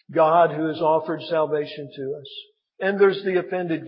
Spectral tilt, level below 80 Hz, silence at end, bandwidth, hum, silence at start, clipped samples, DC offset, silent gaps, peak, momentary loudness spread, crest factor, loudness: -10.5 dB/octave; -78 dBFS; 0 s; 5.6 kHz; none; 0.1 s; under 0.1%; under 0.1%; none; -4 dBFS; 15 LU; 18 dB; -22 LUFS